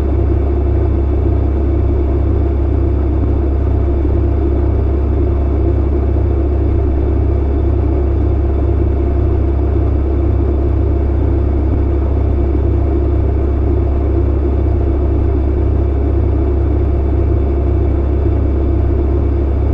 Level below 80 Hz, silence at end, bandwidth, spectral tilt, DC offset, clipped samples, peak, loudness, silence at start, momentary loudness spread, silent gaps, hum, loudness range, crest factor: -14 dBFS; 0 s; 3.6 kHz; -11.5 dB/octave; under 0.1%; under 0.1%; -4 dBFS; -15 LUFS; 0 s; 0 LU; none; none; 0 LU; 10 dB